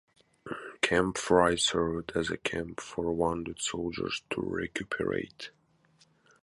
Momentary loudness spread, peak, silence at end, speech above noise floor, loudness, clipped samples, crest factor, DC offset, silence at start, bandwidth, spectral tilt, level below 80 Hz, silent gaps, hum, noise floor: 16 LU; -8 dBFS; 0.95 s; 35 dB; -30 LUFS; under 0.1%; 24 dB; under 0.1%; 0.45 s; 11.5 kHz; -3.5 dB/octave; -54 dBFS; none; none; -66 dBFS